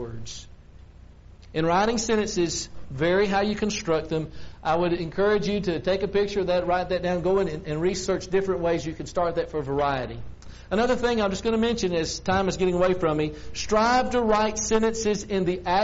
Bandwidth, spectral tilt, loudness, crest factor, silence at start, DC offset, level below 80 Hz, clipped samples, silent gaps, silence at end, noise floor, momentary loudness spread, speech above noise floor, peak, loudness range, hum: 8 kHz; -4.5 dB/octave; -25 LUFS; 18 dB; 0 s; under 0.1%; -44 dBFS; under 0.1%; none; 0 s; -47 dBFS; 8 LU; 23 dB; -6 dBFS; 3 LU; none